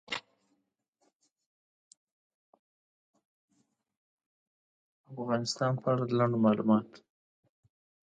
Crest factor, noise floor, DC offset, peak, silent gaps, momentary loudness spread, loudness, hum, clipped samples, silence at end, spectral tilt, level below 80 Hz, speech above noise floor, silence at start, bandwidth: 22 dB; -79 dBFS; under 0.1%; -12 dBFS; 0.88-0.93 s, 1.15-1.19 s, 1.46-1.91 s, 1.97-2.53 s, 2.59-3.14 s, 3.25-3.48 s, 3.97-4.18 s, 4.26-5.04 s; 13 LU; -30 LUFS; none; under 0.1%; 1.15 s; -6.5 dB/octave; -76 dBFS; 50 dB; 0.1 s; 9.2 kHz